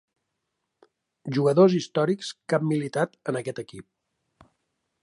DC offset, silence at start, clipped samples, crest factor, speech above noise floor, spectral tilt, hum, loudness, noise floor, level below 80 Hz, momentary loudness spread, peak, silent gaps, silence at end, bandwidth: under 0.1%; 1.25 s; under 0.1%; 22 dB; 56 dB; -6.5 dB/octave; none; -24 LUFS; -80 dBFS; -72 dBFS; 17 LU; -6 dBFS; none; 1.2 s; 11 kHz